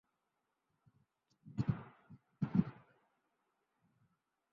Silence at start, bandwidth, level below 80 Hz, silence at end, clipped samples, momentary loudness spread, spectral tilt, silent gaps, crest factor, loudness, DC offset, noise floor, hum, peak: 1.45 s; 7 kHz; -68 dBFS; 1.8 s; under 0.1%; 12 LU; -9.5 dB/octave; none; 26 dB; -40 LUFS; under 0.1%; -86 dBFS; none; -18 dBFS